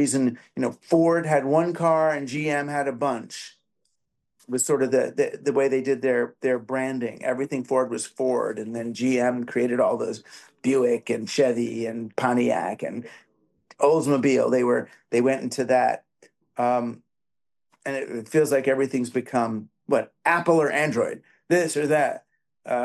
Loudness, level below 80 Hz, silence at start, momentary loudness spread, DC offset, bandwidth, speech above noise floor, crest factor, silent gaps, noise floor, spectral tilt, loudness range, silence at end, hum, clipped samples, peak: -24 LUFS; -74 dBFS; 0 s; 10 LU; under 0.1%; 12.5 kHz; over 67 dB; 16 dB; none; under -90 dBFS; -5 dB/octave; 3 LU; 0 s; none; under 0.1%; -8 dBFS